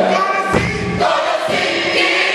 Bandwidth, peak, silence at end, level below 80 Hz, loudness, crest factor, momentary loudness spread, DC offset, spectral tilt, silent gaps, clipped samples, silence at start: 12.5 kHz; -2 dBFS; 0 s; -38 dBFS; -15 LUFS; 14 dB; 4 LU; under 0.1%; -4 dB/octave; none; under 0.1%; 0 s